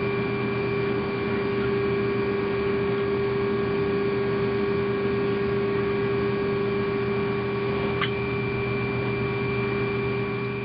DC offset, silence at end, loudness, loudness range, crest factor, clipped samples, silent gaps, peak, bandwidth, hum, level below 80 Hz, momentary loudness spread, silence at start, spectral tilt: under 0.1%; 0 s; -25 LUFS; 1 LU; 14 dB; under 0.1%; none; -12 dBFS; 5.2 kHz; none; -48 dBFS; 2 LU; 0 s; -10.5 dB/octave